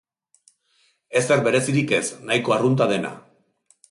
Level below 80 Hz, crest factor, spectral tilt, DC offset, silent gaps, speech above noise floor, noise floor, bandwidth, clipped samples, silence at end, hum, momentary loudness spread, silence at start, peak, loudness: -64 dBFS; 16 dB; -5 dB/octave; under 0.1%; none; 44 dB; -64 dBFS; 11.5 kHz; under 0.1%; 0.7 s; none; 6 LU; 1.1 s; -6 dBFS; -21 LUFS